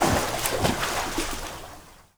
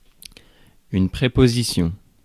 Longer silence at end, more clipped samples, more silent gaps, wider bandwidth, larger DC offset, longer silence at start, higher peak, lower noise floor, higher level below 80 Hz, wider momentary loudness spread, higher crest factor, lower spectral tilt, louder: second, 0.15 s vs 0.3 s; neither; neither; first, over 20 kHz vs 14.5 kHz; neither; second, 0 s vs 0.9 s; about the same, -2 dBFS vs -2 dBFS; second, -47 dBFS vs -52 dBFS; about the same, -38 dBFS vs -36 dBFS; first, 17 LU vs 9 LU; first, 26 dB vs 20 dB; second, -3.5 dB/octave vs -6 dB/octave; second, -26 LUFS vs -20 LUFS